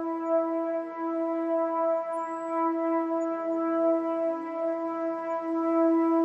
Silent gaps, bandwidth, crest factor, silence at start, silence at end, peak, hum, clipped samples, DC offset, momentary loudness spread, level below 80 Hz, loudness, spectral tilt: none; 7.8 kHz; 12 dB; 0 s; 0 s; -14 dBFS; none; under 0.1%; under 0.1%; 6 LU; under -90 dBFS; -28 LUFS; -6.5 dB/octave